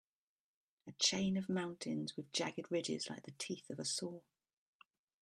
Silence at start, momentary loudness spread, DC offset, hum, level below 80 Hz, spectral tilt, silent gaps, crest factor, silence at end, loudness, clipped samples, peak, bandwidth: 0.85 s; 13 LU; under 0.1%; none; -78 dBFS; -3.5 dB/octave; none; 26 dB; 1 s; -40 LUFS; under 0.1%; -18 dBFS; 12.5 kHz